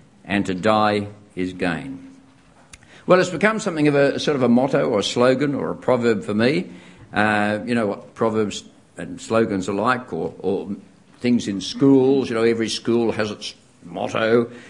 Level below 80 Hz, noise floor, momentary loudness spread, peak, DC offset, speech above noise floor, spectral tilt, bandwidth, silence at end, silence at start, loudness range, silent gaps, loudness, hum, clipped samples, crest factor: -58 dBFS; -51 dBFS; 14 LU; 0 dBFS; under 0.1%; 32 dB; -5.5 dB/octave; 11 kHz; 0 s; 0.25 s; 5 LU; none; -20 LUFS; none; under 0.1%; 20 dB